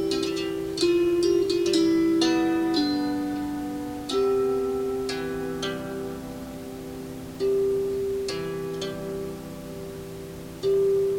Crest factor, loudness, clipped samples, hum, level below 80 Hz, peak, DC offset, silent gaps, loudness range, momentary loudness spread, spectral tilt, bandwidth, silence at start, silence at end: 16 dB; -26 LUFS; under 0.1%; none; -50 dBFS; -10 dBFS; under 0.1%; none; 6 LU; 15 LU; -5 dB/octave; 16.5 kHz; 0 s; 0 s